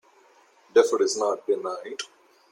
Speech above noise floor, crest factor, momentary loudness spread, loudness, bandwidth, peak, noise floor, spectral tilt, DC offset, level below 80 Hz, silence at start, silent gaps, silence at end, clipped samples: 34 dB; 20 dB; 15 LU; -24 LUFS; 16.5 kHz; -6 dBFS; -58 dBFS; -2 dB/octave; under 0.1%; -78 dBFS; 0.75 s; none; 0.45 s; under 0.1%